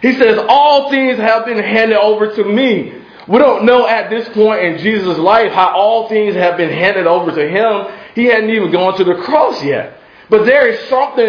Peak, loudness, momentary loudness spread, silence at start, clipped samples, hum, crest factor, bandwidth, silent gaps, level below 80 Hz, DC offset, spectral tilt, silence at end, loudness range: 0 dBFS; -11 LUFS; 6 LU; 0 s; 0.2%; none; 12 dB; 5.4 kHz; none; -54 dBFS; under 0.1%; -6.5 dB/octave; 0 s; 2 LU